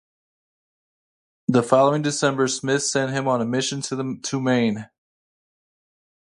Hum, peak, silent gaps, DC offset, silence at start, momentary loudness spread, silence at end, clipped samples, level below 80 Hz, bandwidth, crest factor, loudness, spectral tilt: none; -4 dBFS; none; under 0.1%; 1.5 s; 9 LU; 1.45 s; under 0.1%; -66 dBFS; 11.5 kHz; 20 dB; -22 LUFS; -4.5 dB/octave